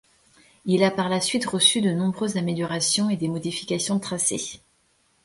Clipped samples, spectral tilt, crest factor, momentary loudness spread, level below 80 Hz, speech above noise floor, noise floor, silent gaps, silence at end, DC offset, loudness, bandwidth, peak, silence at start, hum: under 0.1%; -3.5 dB/octave; 20 dB; 9 LU; -64 dBFS; 41 dB; -65 dBFS; none; 0.7 s; under 0.1%; -23 LUFS; 11.5 kHz; -4 dBFS; 0.65 s; none